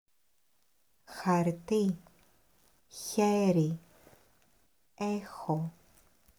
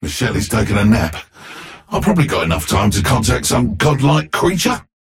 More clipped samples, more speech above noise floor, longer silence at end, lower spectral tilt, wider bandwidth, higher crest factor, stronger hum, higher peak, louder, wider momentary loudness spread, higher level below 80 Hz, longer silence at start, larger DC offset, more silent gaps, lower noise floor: neither; first, 46 dB vs 20 dB; first, 0.7 s vs 0.3 s; first, -6.5 dB/octave vs -5 dB/octave; first, over 20 kHz vs 16.5 kHz; first, 18 dB vs 12 dB; neither; second, -16 dBFS vs -4 dBFS; second, -32 LUFS vs -16 LUFS; about the same, 15 LU vs 13 LU; second, -70 dBFS vs -30 dBFS; first, 1.1 s vs 0 s; neither; neither; first, -76 dBFS vs -35 dBFS